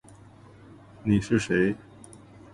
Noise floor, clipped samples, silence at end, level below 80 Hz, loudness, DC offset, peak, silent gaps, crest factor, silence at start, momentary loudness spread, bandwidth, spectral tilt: -51 dBFS; under 0.1%; 0.75 s; -52 dBFS; -26 LUFS; under 0.1%; -8 dBFS; none; 20 dB; 1.05 s; 25 LU; 11.5 kHz; -6.5 dB/octave